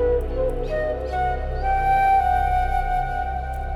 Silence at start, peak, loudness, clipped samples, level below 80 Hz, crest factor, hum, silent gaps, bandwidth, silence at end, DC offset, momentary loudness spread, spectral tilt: 0 s; -10 dBFS; -22 LUFS; under 0.1%; -28 dBFS; 12 dB; none; none; 12.5 kHz; 0 s; under 0.1%; 8 LU; -7 dB/octave